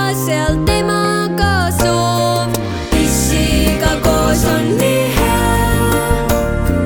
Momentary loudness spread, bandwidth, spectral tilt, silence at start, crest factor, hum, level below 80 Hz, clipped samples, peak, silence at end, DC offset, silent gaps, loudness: 2 LU; over 20 kHz; -5 dB/octave; 0 s; 12 dB; none; -22 dBFS; under 0.1%; -2 dBFS; 0 s; under 0.1%; none; -14 LUFS